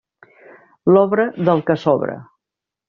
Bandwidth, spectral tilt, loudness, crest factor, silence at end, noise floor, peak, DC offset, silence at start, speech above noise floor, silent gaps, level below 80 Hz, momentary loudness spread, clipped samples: 6.6 kHz; -6.5 dB/octave; -17 LUFS; 16 dB; 0.65 s; -85 dBFS; -2 dBFS; under 0.1%; 0.85 s; 70 dB; none; -60 dBFS; 11 LU; under 0.1%